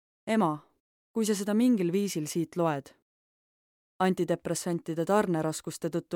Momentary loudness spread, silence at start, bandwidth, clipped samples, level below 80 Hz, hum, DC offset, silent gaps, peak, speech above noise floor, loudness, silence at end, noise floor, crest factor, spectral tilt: 8 LU; 0.25 s; 17 kHz; under 0.1%; -72 dBFS; none; under 0.1%; 0.80-1.14 s, 3.02-4.00 s; -12 dBFS; over 62 dB; -29 LUFS; 0 s; under -90 dBFS; 18 dB; -5.5 dB/octave